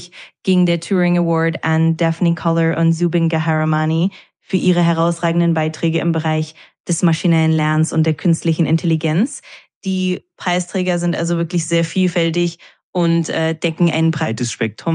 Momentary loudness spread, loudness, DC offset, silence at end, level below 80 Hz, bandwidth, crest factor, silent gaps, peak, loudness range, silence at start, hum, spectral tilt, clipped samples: 7 LU; -17 LUFS; under 0.1%; 0 s; -66 dBFS; 10.5 kHz; 14 dB; 6.80-6.84 s, 9.75-9.81 s, 12.83-12.93 s; -2 dBFS; 2 LU; 0 s; none; -6 dB/octave; under 0.1%